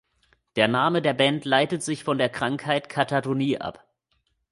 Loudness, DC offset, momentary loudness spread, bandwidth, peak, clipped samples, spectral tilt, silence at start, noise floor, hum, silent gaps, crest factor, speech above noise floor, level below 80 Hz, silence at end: -24 LUFS; under 0.1%; 7 LU; 11.5 kHz; -4 dBFS; under 0.1%; -5 dB/octave; 0.55 s; -72 dBFS; none; none; 22 dB; 48 dB; -64 dBFS; 0.8 s